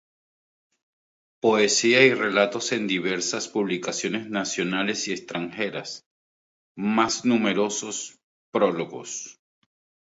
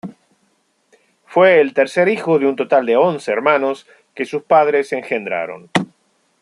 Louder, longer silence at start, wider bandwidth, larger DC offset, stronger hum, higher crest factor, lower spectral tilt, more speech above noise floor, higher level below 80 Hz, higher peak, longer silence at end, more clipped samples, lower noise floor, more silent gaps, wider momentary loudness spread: second, -24 LUFS vs -16 LUFS; first, 1.45 s vs 0.05 s; second, 8 kHz vs 11 kHz; neither; neither; first, 22 dB vs 16 dB; second, -3 dB/octave vs -5.5 dB/octave; first, over 66 dB vs 47 dB; about the same, -70 dBFS vs -68 dBFS; about the same, -4 dBFS vs -2 dBFS; first, 0.85 s vs 0.55 s; neither; first, under -90 dBFS vs -63 dBFS; first, 6.06-6.75 s, 8.23-8.53 s vs none; first, 15 LU vs 12 LU